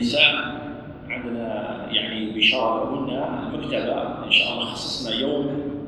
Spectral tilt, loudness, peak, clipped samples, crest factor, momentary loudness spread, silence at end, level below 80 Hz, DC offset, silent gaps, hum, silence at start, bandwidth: -4 dB/octave; -22 LUFS; -2 dBFS; under 0.1%; 22 dB; 13 LU; 0 s; -52 dBFS; under 0.1%; none; none; 0 s; 12 kHz